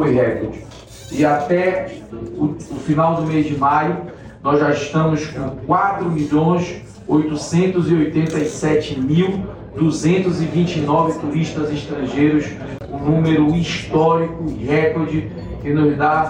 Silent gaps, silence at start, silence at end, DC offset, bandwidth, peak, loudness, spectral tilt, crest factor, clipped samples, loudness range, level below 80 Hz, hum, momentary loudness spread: none; 0 s; 0 s; under 0.1%; 10 kHz; -6 dBFS; -18 LUFS; -7 dB/octave; 12 dB; under 0.1%; 1 LU; -42 dBFS; none; 12 LU